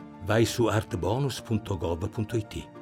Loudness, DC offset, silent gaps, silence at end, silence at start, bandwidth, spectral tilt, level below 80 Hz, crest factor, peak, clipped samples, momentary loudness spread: -28 LUFS; under 0.1%; none; 0 s; 0 s; 16.5 kHz; -6 dB/octave; -52 dBFS; 16 dB; -12 dBFS; under 0.1%; 7 LU